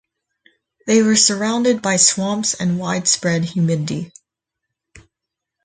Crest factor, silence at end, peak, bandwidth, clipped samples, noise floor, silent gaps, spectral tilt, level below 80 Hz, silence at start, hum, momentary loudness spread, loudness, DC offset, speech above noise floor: 20 dB; 1.55 s; 0 dBFS; 9.6 kHz; under 0.1%; -82 dBFS; none; -3.5 dB/octave; -58 dBFS; 0.85 s; none; 11 LU; -16 LUFS; under 0.1%; 65 dB